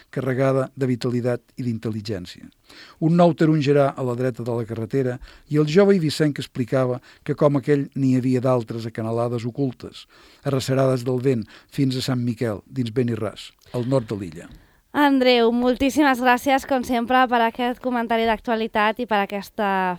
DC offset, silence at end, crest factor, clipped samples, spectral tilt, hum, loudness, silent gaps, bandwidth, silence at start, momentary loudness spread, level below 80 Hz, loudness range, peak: under 0.1%; 0 s; 18 dB; under 0.1%; -6.5 dB/octave; none; -22 LUFS; none; 18 kHz; 0.15 s; 12 LU; -54 dBFS; 5 LU; -4 dBFS